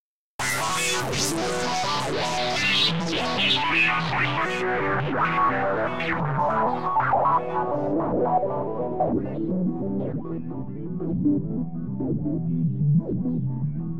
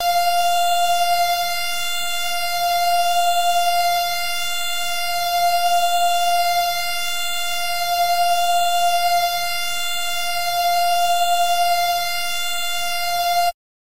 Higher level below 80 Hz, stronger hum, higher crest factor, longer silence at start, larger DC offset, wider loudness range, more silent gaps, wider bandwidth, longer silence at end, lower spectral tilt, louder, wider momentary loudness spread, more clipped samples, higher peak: first, -48 dBFS vs -60 dBFS; neither; first, 14 dB vs 8 dB; about the same, 0 s vs 0 s; first, 1% vs under 0.1%; first, 5 LU vs 0 LU; first, 0.00-0.39 s vs none; about the same, 16 kHz vs 16 kHz; second, 0 s vs 0.45 s; first, -4.5 dB/octave vs 1 dB/octave; second, -24 LUFS vs -19 LUFS; first, 9 LU vs 4 LU; neither; about the same, -10 dBFS vs -10 dBFS